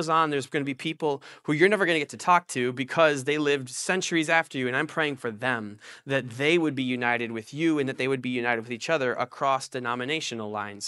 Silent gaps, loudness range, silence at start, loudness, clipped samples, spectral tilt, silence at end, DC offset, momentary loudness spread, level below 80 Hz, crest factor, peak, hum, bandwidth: none; 3 LU; 0 s; -26 LUFS; under 0.1%; -4.5 dB/octave; 0 s; under 0.1%; 8 LU; -72 dBFS; 22 dB; -6 dBFS; none; 12 kHz